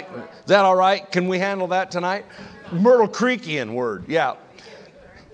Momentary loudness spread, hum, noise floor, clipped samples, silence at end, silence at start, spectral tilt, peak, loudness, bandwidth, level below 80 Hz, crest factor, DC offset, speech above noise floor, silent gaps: 18 LU; none; -46 dBFS; under 0.1%; 0.5 s; 0 s; -5.5 dB/octave; 0 dBFS; -20 LUFS; 8.8 kHz; -62 dBFS; 20 dB; under 0.1%; 26 dB; none